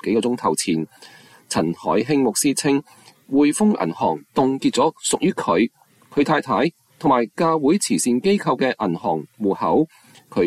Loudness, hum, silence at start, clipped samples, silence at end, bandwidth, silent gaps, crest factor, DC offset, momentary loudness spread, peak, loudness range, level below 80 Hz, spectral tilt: -20 LUFS; none; 0.05 s; under 0.1%; 0 s; 15 kHz; none; 14 dB; under 0.1%; 6 LU; -6 dBFS; 1 LU; -58 dBFS; -4.5 dB/octave